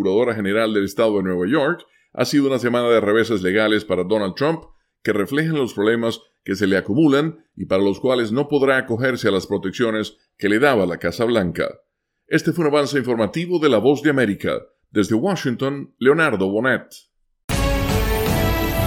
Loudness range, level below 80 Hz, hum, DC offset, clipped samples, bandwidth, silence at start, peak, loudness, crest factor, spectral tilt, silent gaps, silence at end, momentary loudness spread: 2 LU; -36 dBFS; none; under 0.1%; under 0.1%; 17 kHz; 0 s; -2 dBFS; -19 LUFS; 16 dB; -6 dB/octave; 17.44-17.48 s; 0 s; 9 LU